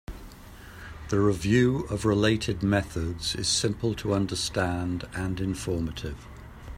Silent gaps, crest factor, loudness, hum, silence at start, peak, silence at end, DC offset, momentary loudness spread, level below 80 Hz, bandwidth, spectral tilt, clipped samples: none; 20 dB; -27 LUFS; none; 0.1 s; -8 dBFS; 0 s; under 0.1%; 21 LU; -44 dBFS; 15.5 kHz; -5 dB/octave; under 0.1%